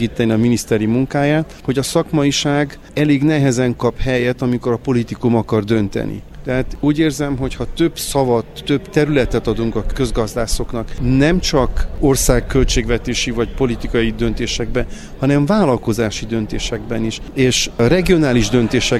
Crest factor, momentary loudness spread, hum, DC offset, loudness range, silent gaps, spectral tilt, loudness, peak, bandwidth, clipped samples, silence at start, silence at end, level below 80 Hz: 16 dB; 8 LU; none; under 0.1%; 2 LU; none; -5 dB/octave; -17 LUFS; 0 dBFS; 15 kHz; under 0.1%; 0 s; 0 s; -26 dBFS